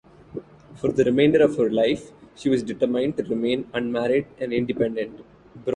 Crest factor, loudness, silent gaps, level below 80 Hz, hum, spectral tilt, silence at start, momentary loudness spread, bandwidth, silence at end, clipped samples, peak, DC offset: 18 dB; -23 LUFS; none; -56 dBFS; none; -6.5 dB/octave; 0.35 s; 15 LU; 10 kHz; 0 s; under 0.1%; -6 dBFS; under 0.1%